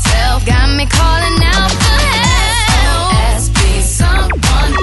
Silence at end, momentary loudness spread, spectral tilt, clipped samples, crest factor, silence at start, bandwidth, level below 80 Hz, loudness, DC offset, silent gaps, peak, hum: 0 s; 2 LU; -3.5 dB/octave; under 0.1%; 10 dB; 0 s; 12 kHz; -14 dBFS; -11 LUFS; under 0.1%; none; 0 dBFS; none